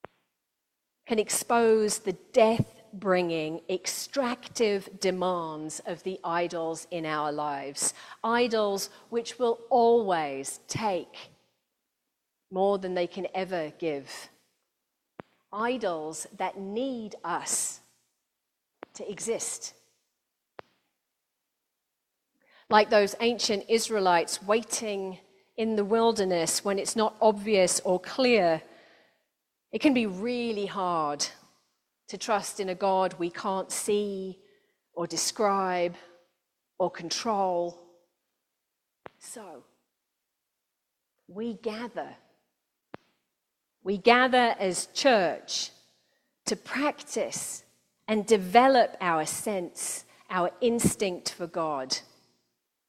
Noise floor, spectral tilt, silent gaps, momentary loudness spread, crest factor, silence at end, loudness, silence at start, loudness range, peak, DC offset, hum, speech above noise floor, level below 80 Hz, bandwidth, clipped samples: -83 dBFS; -3.5 dB/octave; none; 14 LU; 26 dB; 0.85 s; -28 LUFS; 1.05 s; 10 LU; -4 dBFS; under 0.1%; none; 56 dB; -70 dBFS; 16 kHz; under 0.1%